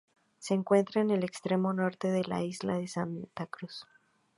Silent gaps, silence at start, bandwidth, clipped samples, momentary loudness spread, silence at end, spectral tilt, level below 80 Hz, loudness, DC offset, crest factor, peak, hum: none; 0.4 s; 11.5 kHz; under 0.1%; 15 LU; 0.55 s; -6.5 dB/octave; -74 dBFS; -31 LUFS; under 0.1%; 20 dB; -12 dBFS; none